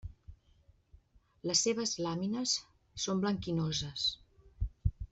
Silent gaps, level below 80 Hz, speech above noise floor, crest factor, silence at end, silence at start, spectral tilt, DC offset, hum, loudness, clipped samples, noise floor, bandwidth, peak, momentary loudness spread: none; -48 dBFS; 32 dB; 22 dB; 0.05 s; 0.05 s; -3.5 dB/octave; under 0.1%; none; -34 LUFS; under 0.1%; -66 dBFS; 8.2 kHz; -14 dBFS; 13 LU